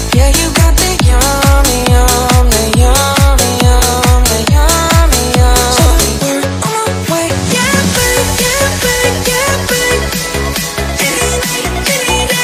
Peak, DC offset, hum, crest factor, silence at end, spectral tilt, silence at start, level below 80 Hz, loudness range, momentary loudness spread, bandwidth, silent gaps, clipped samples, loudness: 0 dBFS; under 0.1%; none; 10 dB; 0 s; -3.5 dB/octave; 0 s; -14 dBFS; 3 LU; 5 LU; 16 kHz; none; 0.2%; -10 LUFS